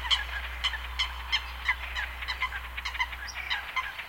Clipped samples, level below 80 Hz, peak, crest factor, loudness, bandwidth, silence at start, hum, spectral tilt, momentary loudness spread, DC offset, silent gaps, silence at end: under 0.1%; -42 dBFS; -14 dBFS; 20 dB; -31 LUFS; 17 kHz; 0 s; none; -1 dB/octave; 6 LU; under 0.1%; none; 0 s